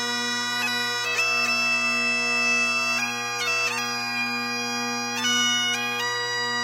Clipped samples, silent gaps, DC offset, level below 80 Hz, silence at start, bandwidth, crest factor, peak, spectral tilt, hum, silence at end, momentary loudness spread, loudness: under 0.1%; none; under 0.1%; -76 dBFS; 0 s; 16.5 kHz; 14 dB; -12 dBFS; -0.5 dB/octave; none; 0 s; 6 LU; -22 LUFS